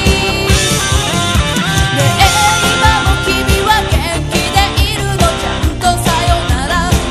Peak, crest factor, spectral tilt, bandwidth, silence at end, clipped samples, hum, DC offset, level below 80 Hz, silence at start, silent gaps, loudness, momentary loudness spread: 0 dBFS; 12 dB; -3.5 dB/octave; 13 kHz; 0 s; 0.1%; none; under 0.1%; -18 dBFS; 0 s; none; -12 LUFS; 5 LU